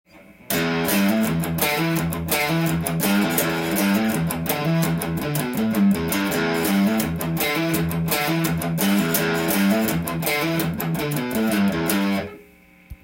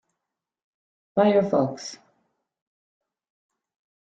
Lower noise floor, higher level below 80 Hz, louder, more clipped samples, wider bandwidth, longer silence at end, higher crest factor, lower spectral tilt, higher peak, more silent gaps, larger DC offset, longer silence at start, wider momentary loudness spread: second, -50 dBFS vs -85 dBFS; first, -48 dBFS vs -70 dBFS; about the same, -21 LUFS vs -22 LUFS; neither; first, 17 kHz vs 8.8 kHz; second, 0.1 s vs 2.05 s; about the same, 18 dB vs 22 dB; second, -5 dB/octave vs -6.5 dB/octave; first, -4 dBFS vs -8 dBFS; neither; neither; second, 0.15 s vs 1.15 s; second, 5 LU vs 17 LU